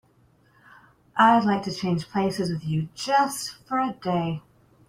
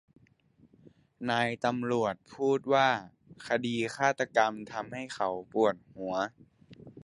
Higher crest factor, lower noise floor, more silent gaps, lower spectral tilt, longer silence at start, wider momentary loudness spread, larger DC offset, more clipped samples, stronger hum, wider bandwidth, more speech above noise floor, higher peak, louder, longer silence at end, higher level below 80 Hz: about the same, 20 dB vs 22 dB; second, -60 dBFS vs -64 dBFS; neither; about the same, -5.5 dB/octave vs -5 dB/octave; about the same, 1.15 s vs 1.2 s; about the same, 12 LU vs 12 LU; neither; neither; neither; first, 16 kHz vs 11.5 kHz; about the same, 37 dB vs 34 dB; first, -6 dBFS vs -10 dBFS; first, -24 LUFS vs -30 LUFS; first, 0.5 s vs 0 s; first, -60 dBFS vs -70 dBFS